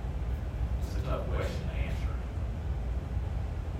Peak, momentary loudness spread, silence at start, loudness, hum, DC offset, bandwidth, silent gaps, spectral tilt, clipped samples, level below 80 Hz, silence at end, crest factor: -20 dBFS; 3 LU; 0 s; -35 LUFS; none; under 0.1%; 9.2 kHz; none; -7.5 dB/octave; under 0.1%; -34 dBFS; 0 s; 14 dB